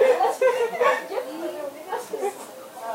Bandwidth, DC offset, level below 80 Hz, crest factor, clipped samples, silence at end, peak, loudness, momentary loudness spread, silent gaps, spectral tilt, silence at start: 16 kHz; under 0.1%; -84 dBFS; 16 dB; under 0.1%; 0 s; -8 dBFS; -25 LUFS; 15 LU; none; -2.5 dB/octave; 0 s